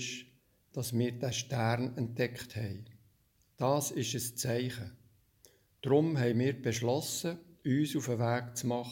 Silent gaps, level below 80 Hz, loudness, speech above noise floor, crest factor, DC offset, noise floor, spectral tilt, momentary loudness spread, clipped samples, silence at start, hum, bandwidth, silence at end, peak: none; -70 dBFS; -33 LUFS; 38 dB; 20 dB; under 0.1%; -70 dBFS; -5 dB/octave; 10 LU; under 0.1%; 0 s; none; 17 kHz; 0 s; -14 dBFS